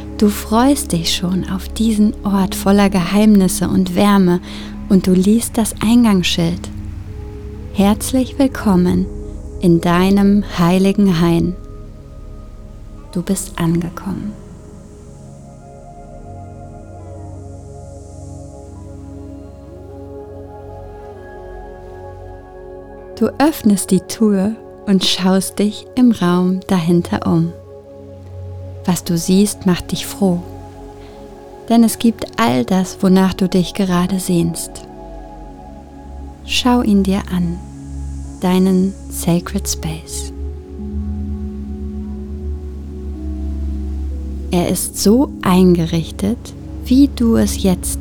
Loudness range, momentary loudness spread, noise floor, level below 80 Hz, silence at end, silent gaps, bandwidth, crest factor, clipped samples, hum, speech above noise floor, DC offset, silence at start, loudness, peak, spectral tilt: 19 LU; 22 LU; -36 dBFS; -32 dBFS; 0 s; none; 19 kHz; 16 dB; under 0.1%; none; 22 dB; under 0.1%; 0 s; -16 LUFS; 0 dBFS; -5.5 dB/octave